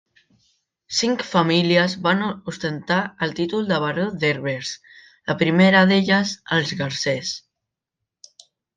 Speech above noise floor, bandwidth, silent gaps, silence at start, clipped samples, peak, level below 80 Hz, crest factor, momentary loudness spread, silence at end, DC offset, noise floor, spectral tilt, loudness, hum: 63 dB; 9.2 kHz; none; 0.9 s; under 0.1%; -4 dBFS; -62 dBFS; 18 dB; 13 LU; 1.4 s; under 0.1%; -83 dBFS; -5 dB/octave; -20 LUFS; none